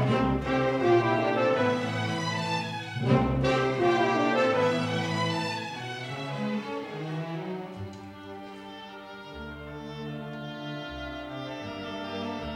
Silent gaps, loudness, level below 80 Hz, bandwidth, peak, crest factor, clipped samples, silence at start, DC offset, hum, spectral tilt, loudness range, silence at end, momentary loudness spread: none; -28 LUFS; -50 dBFS; 13.5 kHz; -10 dBFS; 20 dB; under 0.1%; 0 s; under 0.1%; none; -6 dB/octave; 13 LU; 0 s; 17 LU